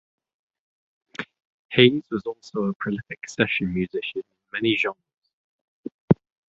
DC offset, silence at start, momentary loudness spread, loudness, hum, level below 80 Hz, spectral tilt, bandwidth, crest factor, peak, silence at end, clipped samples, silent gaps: under 0.1%; 1.2 s; 20 LU; -24 LUFS; none; -56 dBFS; -6 dB/octave; 7.8 kHz; 24 dB; -2 dBFS; 0.35 s; under 0.1%; 1.45-1.69 s, 2.75-2.80 s, 5.18-5.22 s, 5.33-5.83 s, 5.94-6.08 s